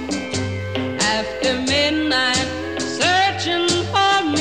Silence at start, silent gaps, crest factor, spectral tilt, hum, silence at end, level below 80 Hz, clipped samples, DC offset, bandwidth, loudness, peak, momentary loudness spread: 0 s; none; 16 dB; -3 dB/octave; none; 0 s; -46 dBFS; under 0.1%; 0.3%; 15 kHz; -19 LUFS; -4 dBFS; 8 LU